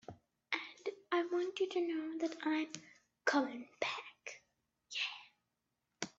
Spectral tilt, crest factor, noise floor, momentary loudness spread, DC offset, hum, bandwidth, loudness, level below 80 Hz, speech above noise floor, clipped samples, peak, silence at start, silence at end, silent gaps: -3 dB/octave; 22 dB; -87 dBFS; 16 LU; under 0.1%; none; 8 kHz; -39 LUFS; -86 dBFS; 49 dB; under 0.1%; -18 dBFS; 0.1 s; 0.1 s; none